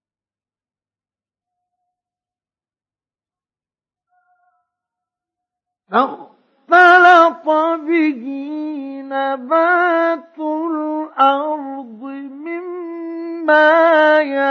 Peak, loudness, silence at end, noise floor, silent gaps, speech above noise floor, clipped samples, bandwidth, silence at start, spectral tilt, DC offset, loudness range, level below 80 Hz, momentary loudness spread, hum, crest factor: 0 dBFS; -14 LUFS; 0 s; under -90 dBFS; none; over 74 dB; under 0.1%; 7 kHz; 5.9 s; -4 dB/octave; under 0.1%; 8 LU; -84 dBFS; 18 LU; none; 18 dB